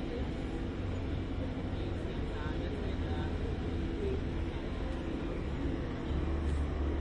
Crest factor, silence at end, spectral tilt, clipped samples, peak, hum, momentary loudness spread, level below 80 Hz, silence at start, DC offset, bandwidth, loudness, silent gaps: 12 dB; 0 s; -8 dB/octave; under 0.1%; -22 dBFS; none; 3 LU; -38 dBFS; 0 s; under 0.1%; 9.2 kHz; -37 LUFS; none